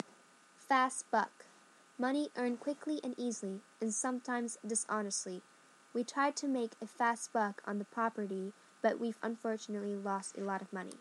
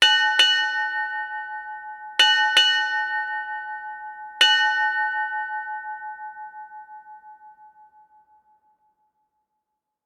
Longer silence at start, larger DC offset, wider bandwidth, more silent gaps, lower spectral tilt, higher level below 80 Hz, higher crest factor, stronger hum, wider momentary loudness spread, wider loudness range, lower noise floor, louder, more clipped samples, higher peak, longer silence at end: first, 0.6 s vs 0 s; neither; second, 12 kHz vs 18 kHz; neither; first, -3.5 dB/octave vs 3.5 dB/octave; second, under -90 dBFS vs -78 dBFS; about the same, 20 dB vs 20 dB; neither; second, 9 LU vs 21 LU; second, 2 LU vs 17 LU; second, -63 dBFS vs -81 dBFS; second, -37 LUFS vs -20 LUFS; neither; second, -18 dBFS vs -4 dBFS; second, 0 s vs 2.4 s